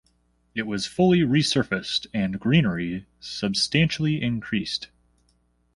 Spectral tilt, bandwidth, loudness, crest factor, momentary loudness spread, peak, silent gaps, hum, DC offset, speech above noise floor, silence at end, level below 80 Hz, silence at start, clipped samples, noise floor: -5.5 dB/octave; 11.5 kHz; -24 LUFS; 20 dB; 12 LU; -6 dBFS; none; 60 Hz at -45 dBFS; under 0.1%; 43 dB; 0.9 s; -52 dBFS; 0.55 s; under 0.1%; -66 dBFS